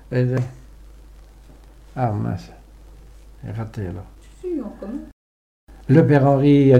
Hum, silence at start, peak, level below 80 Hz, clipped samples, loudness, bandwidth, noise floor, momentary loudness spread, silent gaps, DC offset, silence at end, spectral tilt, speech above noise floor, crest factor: none; 0.1 s; -2 dBFS; -44 dBFS; under 0.1%; -20 LUFS; 7.8 kHz; -44 dBFS; 20 LU; 5.13-5.67 s; under 0.1%; 0 s; -9.5 dB/octave; 27 dB; 18 dB